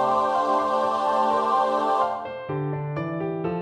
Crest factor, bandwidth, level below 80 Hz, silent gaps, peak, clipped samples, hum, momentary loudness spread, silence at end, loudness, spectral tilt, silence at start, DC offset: 14 dB; 11.5 kHz; -60 dBFS; none; -8 dBFS; under 0.1%; none; 7 LU; 0 s; -24 LUFS; -6.5 dB/octave; 0 s; under 0.1%